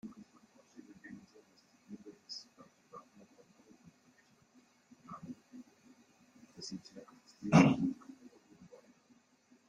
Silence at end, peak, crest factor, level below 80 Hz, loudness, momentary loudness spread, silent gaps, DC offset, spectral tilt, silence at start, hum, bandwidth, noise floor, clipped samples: 1.75 s; -10 dBFS; 28 dB; -70 dBFS; -33 LUFS; 31 LU; none; under 0.1%; -6.5 dB/octave; 0.05 s; none; 10.5 kHz; -69 dBFS; under 0.1%